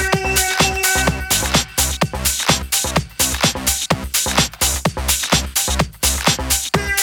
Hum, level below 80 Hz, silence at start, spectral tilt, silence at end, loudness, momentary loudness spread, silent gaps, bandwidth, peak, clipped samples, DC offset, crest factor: none; -28 dBFS; 0 s; -2 dB/octave; 0 s; -16 LUFS; 3 LU; none; over 20 kHz; 0 dBFS; under 0.1%; under 0.1%; 18 dB